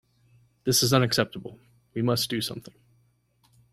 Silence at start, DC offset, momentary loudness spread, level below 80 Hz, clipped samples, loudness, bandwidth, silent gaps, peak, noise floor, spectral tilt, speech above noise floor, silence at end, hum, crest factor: 0.65 s; under 0.1%; 20 LU; -60 dBFS; under 0.1%; -25 LUFS; 16 kHz; none; -6 dBFS; -66 dBFS; -4 dB/octave; 41 dB; 1.15 s; 60 Hz at -45 dBFS; 22 dB